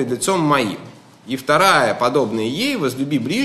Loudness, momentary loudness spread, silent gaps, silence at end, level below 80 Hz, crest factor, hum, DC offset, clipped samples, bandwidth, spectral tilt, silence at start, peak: -17 LUFS; 12 LU; none; 0 s; -64 dBFS; 16 dB; none; under 0.1%; under 0.1%; 13 kHz; -4 dB/octave; 0 s; -2 dBFS